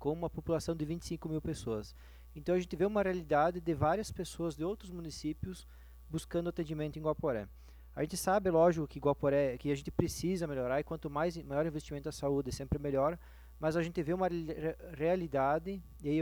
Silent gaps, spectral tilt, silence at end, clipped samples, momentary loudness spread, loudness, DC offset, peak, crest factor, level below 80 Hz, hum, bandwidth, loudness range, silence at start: none; -6.5 dB/octave; 0 s; under 0.1%; 11 LU; -35 LUFS; under 0.1%; -12 dBFS; 22 dB; -52 dBFS; none; over 20 kHz; 6 LU; 0 s